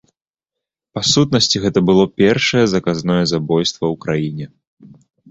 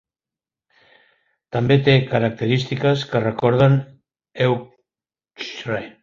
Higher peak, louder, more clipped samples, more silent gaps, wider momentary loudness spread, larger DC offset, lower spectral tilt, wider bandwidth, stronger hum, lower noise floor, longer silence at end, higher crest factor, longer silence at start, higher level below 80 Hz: about the same, -2 dBFS vs -2 dBFS; first, -16 LUFS vs -19 LUFS; neither; first, 4.67-4.77 s vs none; second, 9 LU vs 13 LU; neither; second, -4.5 dB/octave vs -7.5 dB/octave; first, 8.2 kHz vs 7.2 kHz; neither; second, -84 dBFS vs under -90 dBFS; first, 0.45 s vs 0.15 s; about the same, 16 dB vs 18 dB; second, 0.95 s vs 1.55 s; first, -48 dBFS vs -54 dBFS